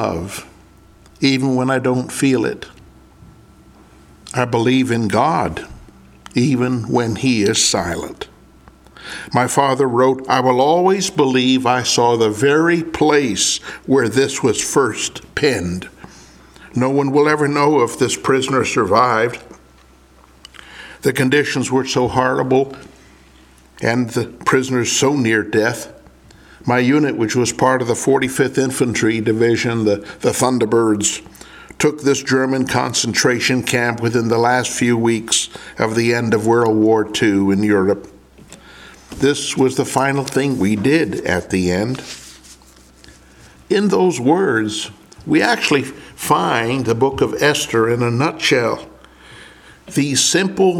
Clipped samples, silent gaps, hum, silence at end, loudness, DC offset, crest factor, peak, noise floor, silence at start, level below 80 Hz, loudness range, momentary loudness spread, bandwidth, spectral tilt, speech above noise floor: under 0.1%; none; none; 0 s; -16 LUFS; under 0.1%; 18 dB; 0 dBFS; -48 dBFS; 0 s; -48 dBFS; 5 LU; 10 LU; 16.5 kHz; -4.5 dB/octave; 32 dB